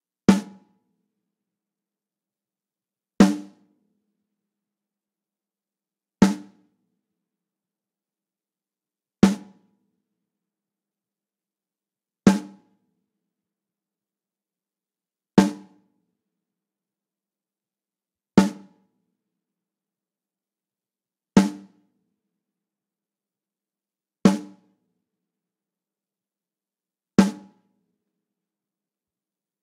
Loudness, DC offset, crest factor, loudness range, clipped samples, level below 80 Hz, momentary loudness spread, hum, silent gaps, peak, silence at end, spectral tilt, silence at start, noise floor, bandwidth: -21 LUFS; under 0.1%; 26 dB; 2 LU; under 0.1%; -58 dBFS; 9 LU; none; none; -2 dBFS; 2.3 s; -6.5 dB/octave; 0.3 s; under -90 dBFS; 13 kHz